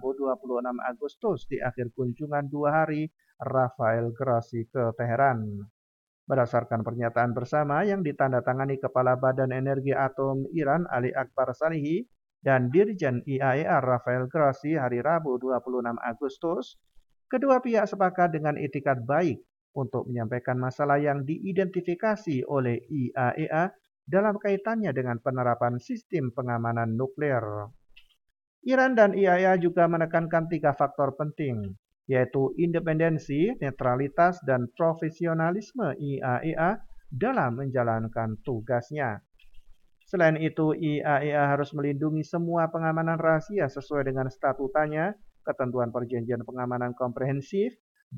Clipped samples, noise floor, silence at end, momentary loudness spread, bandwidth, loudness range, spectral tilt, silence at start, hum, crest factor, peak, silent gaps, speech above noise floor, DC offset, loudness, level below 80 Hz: under 0.1%; -53 dBFS; 0 s; 8 LU; 7.4 kHz; 4 LU; -8.5 dB/octave; 0 s; none; 20 dB; -8 dBFS; 1.17-1.21 s, 5.70-6.27 s, 19.61-19.74 s, 26.05-26.10 s, 28.47-28.62 s, 31.79-31.83 s, 47.80-47.95 s, 48.03-48.11 s; 26 dB; under 0.1%; -27 LUFS; -62 dBFS